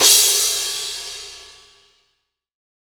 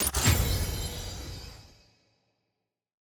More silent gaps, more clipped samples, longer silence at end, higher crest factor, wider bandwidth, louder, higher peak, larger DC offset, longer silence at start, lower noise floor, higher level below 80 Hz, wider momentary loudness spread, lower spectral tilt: neither; neither; about the same, 1.4 s vs 1.45 s; about the same, 20 dB vs 20 dB; about the same, over 20 kHz vs over 20 kHz; first, -16 LUFS vs -29 LUFS; first, 0 dBFS vs -12 dBFS; neither; about the same, 0 s vs 0 s; second, -72 dBFS vs -84 dBFS; second, -58 dBFS vs -38 dBFS; about the same, 21 LU vs 19 LU; second, 2.5 dB/octave vs -3.5 dB/octave